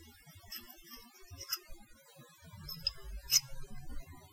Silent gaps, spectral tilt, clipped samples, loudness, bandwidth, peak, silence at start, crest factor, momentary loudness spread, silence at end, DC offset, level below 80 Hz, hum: none; 0 dB/octave; under 0.1%; -35 LUFS; 16.5 kHz; -12 dBFS; 0 s; 28 dB; 27 LU; 0 s; under 0.1%; -52 dBFS; none